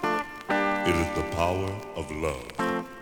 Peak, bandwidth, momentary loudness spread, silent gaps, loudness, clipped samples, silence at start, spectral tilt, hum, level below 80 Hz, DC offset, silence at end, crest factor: -10 dBFS; over 20 kHz; 7 LU; none; -28 LUFS; under 0.1%; 0 s; -5.5 dB/octave; none; -48 dBFS; under 0.1%; 0 s; 18 dB